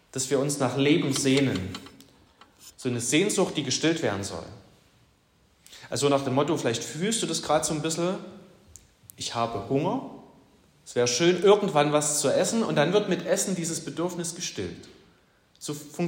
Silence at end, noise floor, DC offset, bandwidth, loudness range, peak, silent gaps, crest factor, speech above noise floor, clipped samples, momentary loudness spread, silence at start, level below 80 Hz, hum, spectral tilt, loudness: 0 s; -63 dBFS; under 0.1%; 16.5 kHz; 6 LU; -8 dBFS; none; 20 dB; 38 dB; under 0.1%; 13 LU; 0.15 s; -64 dBFS; none; -4 dB/octave; -26 LUFS